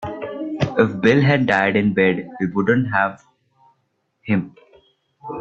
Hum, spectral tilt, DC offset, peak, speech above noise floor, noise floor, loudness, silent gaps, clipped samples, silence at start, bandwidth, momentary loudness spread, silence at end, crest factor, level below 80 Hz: none; -7.5 dB/octave; under 0.1%; -2 dBFS; 51 dB; -69 dBFS; -19 LUFS; none; under 0.1%; 0 s; 8 kHz; 15 LU; 0 s; 18 dB; -54 dBFS